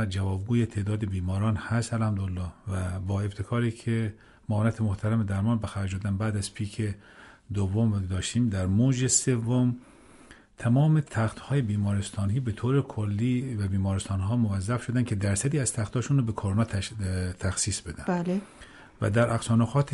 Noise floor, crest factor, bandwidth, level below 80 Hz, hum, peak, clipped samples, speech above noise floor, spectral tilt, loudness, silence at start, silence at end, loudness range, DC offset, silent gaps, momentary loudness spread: -52 dBFS; 16 dB; 11.5 kHz; -52 dBFS; none; -10 dBFS; under 0.1%; 26 dB; -6 dB/octave; -28 LUFS; 0 s; 0 s; 4 LU; under 0.1%; none; 8 LU